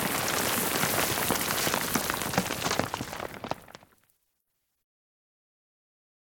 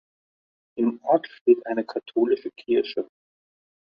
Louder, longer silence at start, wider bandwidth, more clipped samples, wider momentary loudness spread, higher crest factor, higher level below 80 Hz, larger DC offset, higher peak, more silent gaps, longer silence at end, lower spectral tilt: second, -28 LUFS vs -24 LUFS; second, 0 s vs 0.75 s; first, 19 kHz vs 5.6 kHz; neither; about the same, 12 LU vs 10 LU; about the same, 24 dB vs 20 dB; first, -56 dBFS vs -72 dBFS; neither; about the same, -8 dBFS vs -6 dBFS; second, none vs 1.41-1.46 s; first, 2.75 s vs 0.8 s; second, -2.5 dB/octave vs -8 dB/octave